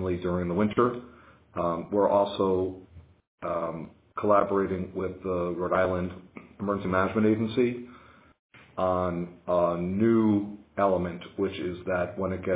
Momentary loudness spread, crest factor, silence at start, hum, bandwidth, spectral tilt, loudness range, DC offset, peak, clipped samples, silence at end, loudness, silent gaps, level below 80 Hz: 13 LU; 18 dB; 0 s; none; 4 kHz; -11 dB/octave; 2 LU; under 0.1%; -10 dBFS; under 0.1%; 0 s; -27 LUFS; 3.27-3.38 s, 8.39-8.49 s; -50 dBFS